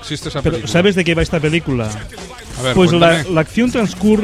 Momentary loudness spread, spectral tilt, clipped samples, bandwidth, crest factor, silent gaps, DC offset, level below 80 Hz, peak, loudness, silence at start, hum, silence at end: 13 LU; -5.5 dB/octave; under 0.1%; 14 kHz; 14 dB; none; under 0.1%; -34 dBFS; 0 dBFS; -15 LUFS; 0 s; none; 0 s